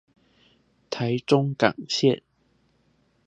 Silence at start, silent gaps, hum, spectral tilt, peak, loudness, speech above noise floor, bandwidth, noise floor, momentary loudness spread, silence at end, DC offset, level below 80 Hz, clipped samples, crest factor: 0.9 s; none; none; -5.5 dB/octave; -2 dBFS; -24 LUFS; 44 dB; 9.6 kHz; -66 dBFS; 9 LU; 1.1 s; under 0.1%; -68 dBFS; under 0.1%; 24 dB